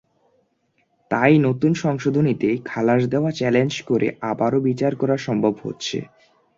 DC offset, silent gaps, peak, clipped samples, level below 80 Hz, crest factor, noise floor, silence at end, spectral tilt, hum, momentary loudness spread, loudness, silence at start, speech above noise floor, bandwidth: under 0.1%; none; -2 dBFS; under 0.1%; -58 dBFS; 18 dB; -67 dBFS; 0.5 s; -7 dB/octave; none; 9 LU; -20 LUFS; 1.1 s; 47 dB; 7.6 kHz